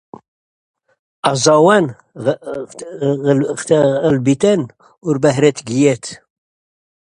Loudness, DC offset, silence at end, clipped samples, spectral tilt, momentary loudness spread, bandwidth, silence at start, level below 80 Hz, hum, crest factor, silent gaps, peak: -15 LUFS; under 0.1%; 1 s; under 0.1%; -5.5 dB/octave; 15 LU; 11 kHz; 1.25 s; -56 dBFS; none; 16 dB; none; 0 dBFS